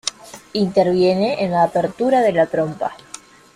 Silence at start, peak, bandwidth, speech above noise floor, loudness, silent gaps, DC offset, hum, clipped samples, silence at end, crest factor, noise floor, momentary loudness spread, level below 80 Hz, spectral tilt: 0.05 s; -4 dBFS; 13.5 kHz; 24 dB; -18 LUFS; none; under 0.1%; none; under 0.1%; 0.4 s; 16 dB; -41 dBFS; 12 LU; -56 dBFS; -5.5 dB/octave